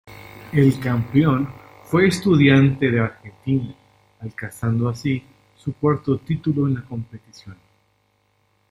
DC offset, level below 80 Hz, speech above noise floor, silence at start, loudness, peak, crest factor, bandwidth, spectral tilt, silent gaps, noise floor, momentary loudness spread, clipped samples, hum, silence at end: under 0.1%; -50 dBFS; 46 dB; 0.1 s; -20 LUFS; -2 dBFS; 18 dB; 16 kHz; -7.5 dB/octave; none; -65 dBFS; 18 LU; under 0.1%; none; 1.2 s